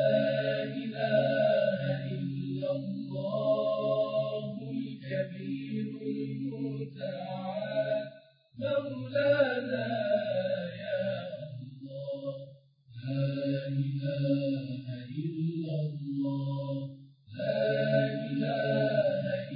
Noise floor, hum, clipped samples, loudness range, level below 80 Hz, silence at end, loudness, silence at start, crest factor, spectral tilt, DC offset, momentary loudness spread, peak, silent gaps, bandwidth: -55 dBFS; none; under 0.1%; 5 LU; -76 dBFS; 0 s; -32 LUFS; 0 s; 16 dB; -6 dB/octave; under 0.1%; 11 LU; -14 dBFS; none; 5 kHz